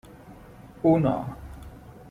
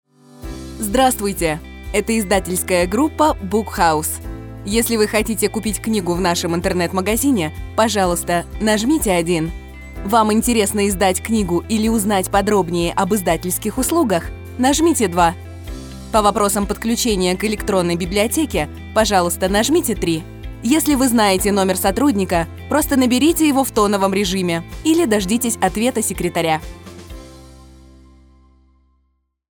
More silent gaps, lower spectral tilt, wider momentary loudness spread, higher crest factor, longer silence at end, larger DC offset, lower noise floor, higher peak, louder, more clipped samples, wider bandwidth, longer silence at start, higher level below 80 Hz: neither; first, -9.5 dB/octave vs -4 dB/octave; first, 26 LU vs 10 LU; about the same, 18 dB vs 16 dB; second, 0.2 s vs 1.9 s; neither; second, -47 dBFS vs -66 dBFS; second, -10 dBFS vs -2 dBFS; second, -24 LUFS vs -17 LUFS; neither; second, 14 kHz vs over 20 kHz; second, 0.25 s vs 0.4 s; second, -48 dBFS vs -36 dBFS